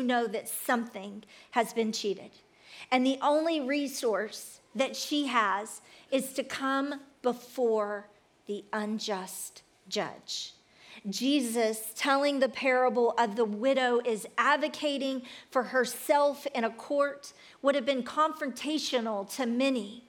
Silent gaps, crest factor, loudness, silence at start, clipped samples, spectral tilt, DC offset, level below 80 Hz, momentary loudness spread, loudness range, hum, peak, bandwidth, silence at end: none; 18 dB; -30 LUFS; 0 s; under 0.1%; -3 dB/octave; under 0.1%; -82 dBFS; 13 LU; 6 LU; none; -12 dBFS; 19 kHz; 0.1 s